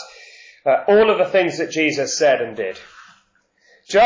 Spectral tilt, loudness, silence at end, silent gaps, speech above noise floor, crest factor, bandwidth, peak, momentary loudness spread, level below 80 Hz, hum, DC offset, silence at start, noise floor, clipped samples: -3.5 dB/octave; -18 LUFS; 0 s; none; 43 dB; 14 dB; 7.6 kHz; -6 dBFS; 14 LU; -58 dBFS; none; under 0.1%; 0 s; -61 dBFS; under 0.1%